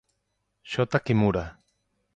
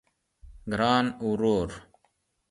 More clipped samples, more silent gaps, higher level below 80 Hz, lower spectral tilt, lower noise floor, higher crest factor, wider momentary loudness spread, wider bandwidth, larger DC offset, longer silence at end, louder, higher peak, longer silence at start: neither; neither; about the same, -50 dBFS vs -52 dBFS; first, -7.5 dB/octave vs -6 dB/octave; first, -77 dBFS vs -72 dBFS; about the same, 20 dB vs 20 dB; second, 10 LU vs 17 LU; second, 8.8 kHz vs 11.5 kHz; neither; about the same, 0.65 s vs 0.7 s; about the same, -26 LUFS vs -27 LUFS; about the same, -8 dBFS vs -8 dBFS; first, 0.65 s vs 0.45 s